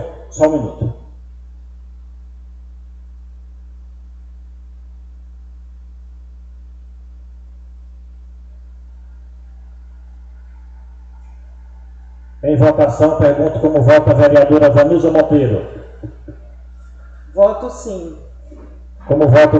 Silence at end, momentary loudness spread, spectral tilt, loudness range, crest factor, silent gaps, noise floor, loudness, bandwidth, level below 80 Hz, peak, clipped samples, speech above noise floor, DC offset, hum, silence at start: 0 s; 25 LU; -8 dB/octave; 12 LU; 16 dB; none; -36 dBFS; -12 LUFS; 7.8 kHz; -36 dBFS; 0 dBFS; under 0.1%; 25 dB; under 0.1%; 60 Hz at -35 dBFS; 0 s